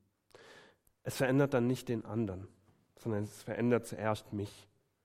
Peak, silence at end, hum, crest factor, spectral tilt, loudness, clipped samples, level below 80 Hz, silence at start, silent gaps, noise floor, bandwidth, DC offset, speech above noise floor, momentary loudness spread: -16 dBFS; 0.45 s; none; 20 dB; -6.5 dB/octave; -35 LUFS; under 0.1%; -70 dBFS; 0.4 s; none; -63 dBFS; 16 kHz; under 0.1%; 29 dB; 16 LU